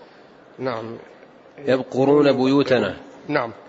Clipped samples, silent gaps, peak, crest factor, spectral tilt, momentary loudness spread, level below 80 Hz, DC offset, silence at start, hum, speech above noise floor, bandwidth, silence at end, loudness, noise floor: under 0.1%; none; -4 dBFS; 16 dB; -7 dB/octave; 17 LU; -64 dBFS; under 0.1%; 0.6 s; none; 28 dB; 7.8 kHz; 0.15 s; -20 LUFS; -48 dBFS